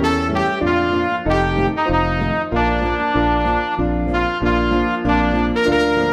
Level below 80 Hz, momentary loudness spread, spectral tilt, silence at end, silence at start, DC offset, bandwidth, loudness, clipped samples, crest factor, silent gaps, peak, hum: -28 dBFS; 3 LU; -7 dB/octave; 0 s; 0 s; under 0.1%; 11.5 kHz; -18 LUFS; under 0.1%; 14 dB; none; -4 dBFS; none